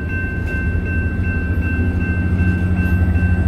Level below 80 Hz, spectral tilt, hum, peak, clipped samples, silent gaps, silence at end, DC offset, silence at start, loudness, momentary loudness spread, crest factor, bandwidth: -22 dBFS; -9 dB/octave; none; -6 dBFS; under 0.1%; none; 0 s; under 0.1%; 0 s; -19 LUFS; 4 LU; 12 dB; 5 kHz